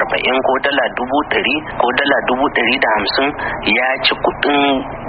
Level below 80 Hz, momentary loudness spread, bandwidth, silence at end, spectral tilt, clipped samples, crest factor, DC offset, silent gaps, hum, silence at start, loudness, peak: -42 dBFS; 4 LU; 5 kHz; 0 s; -1 dB/octave; under 0.1%; 16 dB; under 0.1%; none; none; 0 s; -15 LUFS; 0 dBFS